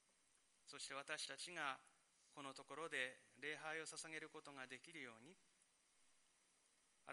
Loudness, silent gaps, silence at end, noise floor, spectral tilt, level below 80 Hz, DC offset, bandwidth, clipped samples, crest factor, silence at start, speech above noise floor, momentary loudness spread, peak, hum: -51 LUFS; none; 0 s; -79 dBFS; -1.5 dB/octave; under -90 dBFS; under 0.1%; 11.5 kHz; under 0.1%; 26 dB; 0.65 s; 26 dB; 15 LU; -30 dBFS; none